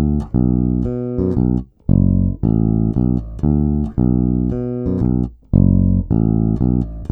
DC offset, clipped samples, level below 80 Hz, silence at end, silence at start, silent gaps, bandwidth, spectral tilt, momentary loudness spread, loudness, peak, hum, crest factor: under 0.1%; under 0.1%; -24 dBFS; 0.05 s; 0 s; none; 1.8 kHz; -13 dB/octave; 6 LU; -17 LUFS; 0 dBFS; none; 16 dB